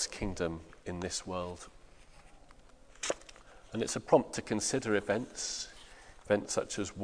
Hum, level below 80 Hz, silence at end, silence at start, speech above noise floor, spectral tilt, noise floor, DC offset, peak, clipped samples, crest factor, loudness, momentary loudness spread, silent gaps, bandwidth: none; -56 dBFS; 0 s; 0 s; 23 dB; -3.5 dB/octave; -56 dBFS; under 0.1%; -10 dBFS; under 0.1%; 24 dB; -34 LUFS; 18 LU; none; 10.5 kHz